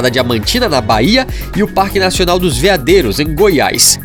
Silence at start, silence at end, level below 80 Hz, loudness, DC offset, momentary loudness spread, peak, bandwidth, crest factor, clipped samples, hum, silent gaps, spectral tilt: 0 s; 0 s; -26 dBFS; -11 LUFS; under 0.1%; 5 LU; 0 dBFS; over 20 kHz; 12 dB; under 0.1%; none; none; -3.5 dB/octave